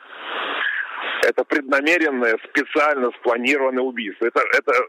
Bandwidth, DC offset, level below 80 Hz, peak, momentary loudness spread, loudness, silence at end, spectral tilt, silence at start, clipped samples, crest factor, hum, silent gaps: 16 kHz; under 0.1%; -80 dBFS; -6 dBFS; 8 LU; -20 LUFS; 0 s; -2.5 dB/octave; 0 s; under 0.1%; 14 dB; none; none